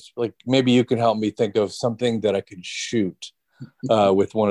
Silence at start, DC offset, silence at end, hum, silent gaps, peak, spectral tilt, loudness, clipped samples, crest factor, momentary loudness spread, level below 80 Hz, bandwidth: 0.05 s; under 0.1%; 0 s; none; none; -4 dBFS; -5.5 dB/octave; -21 LUFS; under 0.1%; 18 dB; 12 LU; -58 dBFS; 11.5 kHz